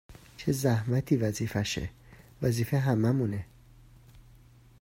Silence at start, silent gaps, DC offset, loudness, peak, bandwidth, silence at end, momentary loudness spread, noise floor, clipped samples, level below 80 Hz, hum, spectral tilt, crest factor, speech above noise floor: 0.1 s; none; under 0.1%; -29 LUFS; -12 dBFS; 16 kHz; 0.6 s; 9 LU; -56 dBFS; under 0.1%; -54 dBFS; none; -6.5 dB/octave; 18 dB; 28 dB